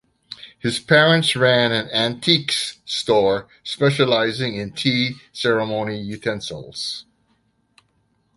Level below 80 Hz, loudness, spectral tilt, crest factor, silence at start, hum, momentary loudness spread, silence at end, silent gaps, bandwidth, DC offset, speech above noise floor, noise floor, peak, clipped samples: -58 dBFS; -19 LUFS; -4.5 dB/octave; 20 dB; 0.3 s; none; 12 LU; 1.35 s; none; 11.5 kHz; under 0.1%; 45 dB; -65 dBFS; -2 dBFS; under 0.1%